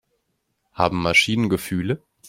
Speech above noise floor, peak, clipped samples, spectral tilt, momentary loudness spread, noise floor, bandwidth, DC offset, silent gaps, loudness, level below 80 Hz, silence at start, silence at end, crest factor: 52 dB; -2 dBFS; under 0.1%; -4.5 dB/octave; 9 LU; -73 dBFS; 16 kHz; under 0.1%; none; -20 LUFS; -50 dBFS; 0.75 s; 0 s; 22 dB